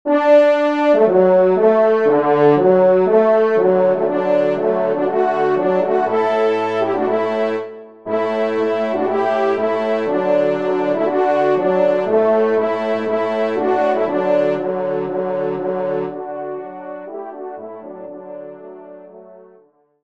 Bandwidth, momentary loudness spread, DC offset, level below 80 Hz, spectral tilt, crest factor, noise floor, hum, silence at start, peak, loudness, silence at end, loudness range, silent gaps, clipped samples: 7.4 kHz; 18 LU; 0.4%; -68 dBFS; -7.5 dB/octave; 14 dB; -53 dBFS; none; 0.05 s; -2 dBFS; -16 LUFS; 0.65 s; 12 LU; none; under 0.1%